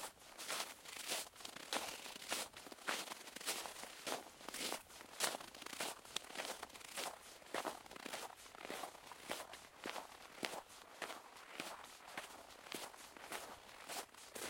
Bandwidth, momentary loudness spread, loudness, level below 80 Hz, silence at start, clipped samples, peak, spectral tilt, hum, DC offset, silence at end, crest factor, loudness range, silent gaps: 16.5 kHz; 10 LU; -47 LUFS; -80 dBFS; 0 s; under 0.1%; -18 dBFS; -0.5 dB/octave; none; under 0.1%; 0 s; 32 dB; 5 LU; none